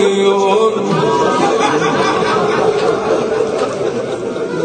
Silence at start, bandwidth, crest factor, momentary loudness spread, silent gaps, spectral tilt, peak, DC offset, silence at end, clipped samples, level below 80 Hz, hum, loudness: 0 s; 9.4 kHz; 12 dB; 7 LU; none; -5 dB/octave; -2 dBFS; under 0.1%; 0 s; under 0.1%; -52 dBFS; none; -14 LUFS